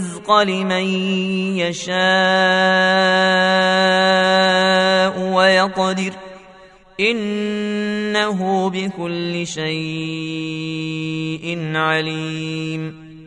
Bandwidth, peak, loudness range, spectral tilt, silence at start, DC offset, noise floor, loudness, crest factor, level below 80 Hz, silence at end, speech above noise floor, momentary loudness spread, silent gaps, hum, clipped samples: 11 kHz; 0 dBFS; 8 LU; -4.5 dB/octave; 0 s; under 0.1%; -45 dBFS; -17 LUFS; 18 dB; -58 dBFS; 0 s; 27 dB; 11 LU; none; none; under 0.1%